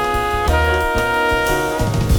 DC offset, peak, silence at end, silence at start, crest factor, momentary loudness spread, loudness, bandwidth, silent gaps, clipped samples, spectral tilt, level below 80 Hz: under 0.1%; -2 dBFS; 0 s; 0 s; 14 dB; 3 LU; -17 LUFS; 20 kHz; none; under 0.1%; -5 dB/octave; -24 dBFS